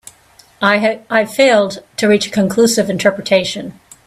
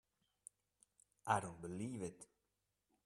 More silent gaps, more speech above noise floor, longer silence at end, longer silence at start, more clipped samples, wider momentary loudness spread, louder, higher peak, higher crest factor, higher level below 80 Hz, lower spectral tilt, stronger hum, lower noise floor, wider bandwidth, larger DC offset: neither; second, 34 dB vs 45 dB; second, 0.35 s vs 0.8 s; second, 0.6 s vs 1.25 s; neither; second, 8 LU vs 22 LU; first, -14 LUFS vs -44 LUFS; first, 0 dBFS vs -20 dBFS; second, 14 dB vs 28 dB; first, -56 dBFS vs -78 dBFS; about the same, -4 dB/octave vs -5 dB/octave; neither; second, -48 dBFS vs -88 dBFS; first, 15.5 kHz vs 13.5 kHz; neither